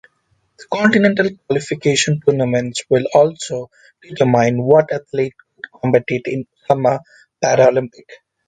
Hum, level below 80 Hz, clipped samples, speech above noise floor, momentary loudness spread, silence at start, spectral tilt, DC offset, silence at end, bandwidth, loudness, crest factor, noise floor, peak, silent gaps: none; -58 dBFS; under 0.1%; 48 dB; 13 LU; 0.6 s; -5 dB/octave; under 0.1%; 0.3 s; 9.4 kHz; -16 LUFS; 16 dB; -64 dBFS; 0 dBFS; none